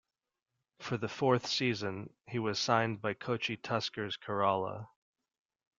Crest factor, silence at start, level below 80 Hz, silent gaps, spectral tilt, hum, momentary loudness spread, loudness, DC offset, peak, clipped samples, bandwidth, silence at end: 22 dB; 0.8 s; -74 dBFS; none; -5 dB/octave; none; 11 LU; -34 LUFS; under 0.1%; -12 dBFS; under 0.1%; 7.6 kHz; 0.95 s